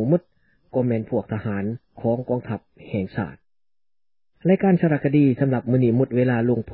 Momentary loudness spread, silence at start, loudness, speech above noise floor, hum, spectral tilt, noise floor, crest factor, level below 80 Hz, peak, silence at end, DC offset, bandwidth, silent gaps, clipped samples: 12 LU; 0 s; -22 LUFS; over 69 dB; none; -13.5 dB/octave; under -90 dBFS; 16 dB; -52 dBFS; -6 dBFS; 0 s; under 0.1%; 4.4 kHz; none; under 0.1%